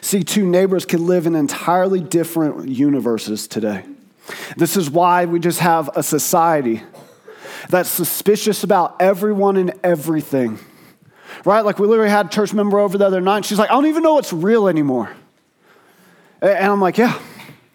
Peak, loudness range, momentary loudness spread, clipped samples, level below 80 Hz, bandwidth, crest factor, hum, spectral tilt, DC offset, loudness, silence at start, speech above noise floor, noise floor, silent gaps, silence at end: 0 dBFS; 3 LU; 8 LU; under 0.1%; -70 dBFS; 20 kHz; 16 dB; none; -5 dB/octave; under 0.1%; -16 LUFS; 0 s; 38 dB; -54 dBFS; none; 0.25 s